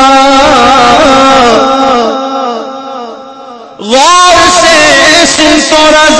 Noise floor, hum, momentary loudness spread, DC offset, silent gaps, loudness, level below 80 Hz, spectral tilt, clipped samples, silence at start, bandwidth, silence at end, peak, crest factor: -26 dBFS; none; 16 LU; under 0.1%; none; -4 LUFS; -32 dBFS; -2 dB/octave; 8%; 0 s; 11 kHz; 0 s; 0 dBFS; 4 dB